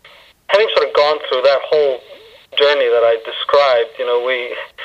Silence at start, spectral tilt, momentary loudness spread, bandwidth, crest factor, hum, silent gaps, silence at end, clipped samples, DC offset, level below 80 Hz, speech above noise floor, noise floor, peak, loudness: 0.5 s; -2.5 dB/octave; 7 LU; 8 kHz; 14 dB; none; none; 0 s; under 0.1%; under 0.1%; -62 dBFS; 24 dB; -39 dBFS; 0 dBFS; -15 LUFS